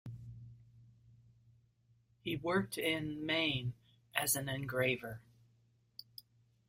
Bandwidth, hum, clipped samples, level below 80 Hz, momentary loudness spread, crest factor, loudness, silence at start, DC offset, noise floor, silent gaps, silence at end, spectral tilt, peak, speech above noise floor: 16 kHz; none; under 0.1%; -68 dBFS; 22 LU; 28 dB; -36 LUFS; 0.05 s; under 0.1%; -72 dBFS; none; 0.65 s; -3.5 dB/octave; -12 dBFS; 36 dB